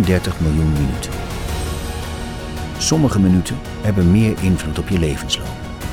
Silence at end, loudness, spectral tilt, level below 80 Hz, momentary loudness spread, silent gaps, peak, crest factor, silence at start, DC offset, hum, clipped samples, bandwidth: 0 s; -19 LUFS; -5.5 dB/octave; -30 dBFS; 12 LU; none; -2 dBFS; 16 dB; 0 s; under 0.1%; none; under 0.1%; 17 kHz